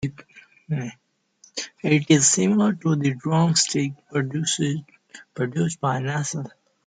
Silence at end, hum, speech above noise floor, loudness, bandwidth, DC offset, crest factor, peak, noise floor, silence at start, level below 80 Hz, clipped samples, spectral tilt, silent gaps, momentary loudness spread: 0.35 s; none; 35 dB; -22 LUFS; 9.6 kHz; under 0.1%; 20 dB; -4 dBFS; -57 dBFS; 0 s; -62 dBFS; under 0.1%; -4.5 dB/octave; none; 16 LU